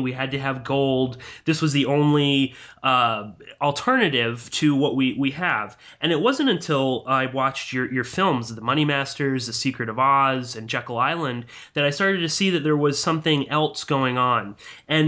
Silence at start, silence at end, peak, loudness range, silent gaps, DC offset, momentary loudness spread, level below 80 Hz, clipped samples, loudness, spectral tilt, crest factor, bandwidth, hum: 0 s; 0 s; -8 dBFS; 2 LU; none; under 0.1%; 8 LU; -60 dBFS; under 0.1%; -22 LUFS; -5 dB/octave; 16 dB; 8 kHz; none